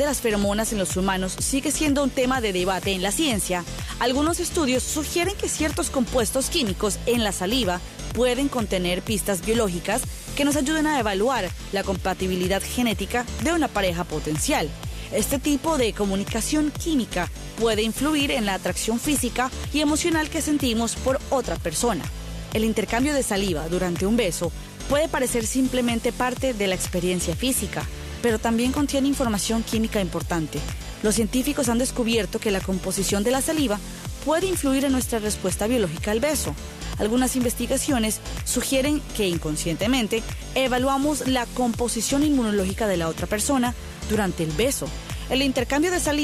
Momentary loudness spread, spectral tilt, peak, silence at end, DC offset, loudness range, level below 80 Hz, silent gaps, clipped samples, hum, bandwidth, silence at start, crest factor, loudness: 5 LU; -4 dB/octave; -10 dBFS; 0 s; under 0.1%; 1 LU; -36 dBFS; none; under 0.1%; none; 14.5 kHz; 0 s; 14 dB; -24 LUFS